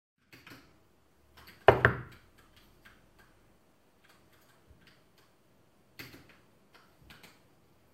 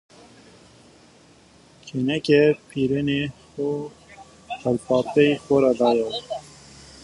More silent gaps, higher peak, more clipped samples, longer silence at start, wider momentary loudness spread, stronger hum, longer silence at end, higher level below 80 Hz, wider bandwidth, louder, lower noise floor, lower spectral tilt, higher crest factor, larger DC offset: neither; about the same, -2 dBFS vs -4 dBFS; neither; second, 1.7 s vs 1.85 s; first, 32 LU vs 15 LU; neither; first, 1.9 s vs 0.6 s; about the same, -58 dBFS vs -56 dBFS; first, 16.5 kHz vs 11.5 kHz; second, -27 LUFS vs -22 LUFS; first, -67 dBFS vs -52 dBFS; about the same, -6.5 dB/octave vs -6.5 dB/octave; first, 34 dB vs 20 dB; neither